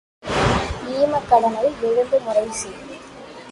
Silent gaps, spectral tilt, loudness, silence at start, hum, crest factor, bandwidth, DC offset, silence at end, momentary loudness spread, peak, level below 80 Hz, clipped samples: none; -4.5 dB/octave; -20 LUFS; 0.25 s; none; 18 dB; 11.5 kHz; under 0.1%; 0 s; 20 LU; -2 dBFS; -40 dBFS; under 0.1%